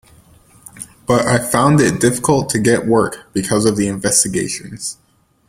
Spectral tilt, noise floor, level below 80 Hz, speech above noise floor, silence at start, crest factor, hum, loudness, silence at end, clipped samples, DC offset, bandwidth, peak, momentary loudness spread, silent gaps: -4.5 dB/octave; -48 dBFS; -46 dBFS; 32 dB; 0.75 s; 16 dB; none; -15 LUFS; 0.55 s; under 0.1%; under 0.1%; 16.5 kHz; 0 dBFS; 13 LU; none